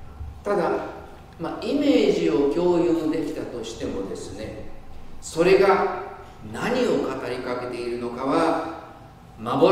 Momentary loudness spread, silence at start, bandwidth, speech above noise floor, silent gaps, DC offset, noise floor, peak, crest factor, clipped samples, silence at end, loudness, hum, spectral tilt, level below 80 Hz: 19 LU; 0 s; 15 kHz; 22 dB; none; under 0.1%; -44 dBFS; -4 dBFS; 20 dB; under 0.1%; 0 s; -23 LUFS; none; -6 dB/octave; -46 dBFS